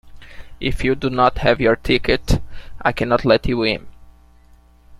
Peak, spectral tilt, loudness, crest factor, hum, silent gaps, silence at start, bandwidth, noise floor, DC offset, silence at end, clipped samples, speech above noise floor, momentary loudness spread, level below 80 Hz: -2 dBFS; -6 dB/octave; -19 LUFS; 18 dB; none; none; 0.05 s; 14.5 kHz; -49 dBFS; under 0.1%; 0.05 s; under 0.1%; 32 dB; 7 LU; -30 dBFS